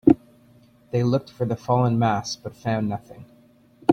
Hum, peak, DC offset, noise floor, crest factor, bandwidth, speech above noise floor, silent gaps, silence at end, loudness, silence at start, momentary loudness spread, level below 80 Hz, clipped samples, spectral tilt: none; -2 dBFS; under 0.1%; -54 dBFS; 22 dB; 8.4 kHz; 31 dB; none; 0 s; -24 LUFS; 0.05 s; 10 LU; -54 dBFS; under 0.1%; -7 dB/octave